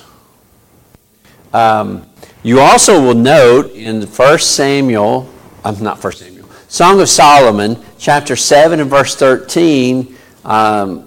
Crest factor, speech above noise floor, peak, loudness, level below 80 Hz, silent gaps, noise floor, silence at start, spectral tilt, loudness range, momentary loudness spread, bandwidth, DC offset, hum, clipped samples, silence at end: 10 dB; 39 dB; 0 dBFS; -9 LUFS; -44 dBFS; none; -48 dBFS; 1.55 s; -3.5 dB/octave; 3 LU; 15 LU; 17 kHz; under 0.1%; none; under 0.1%; 0.05 s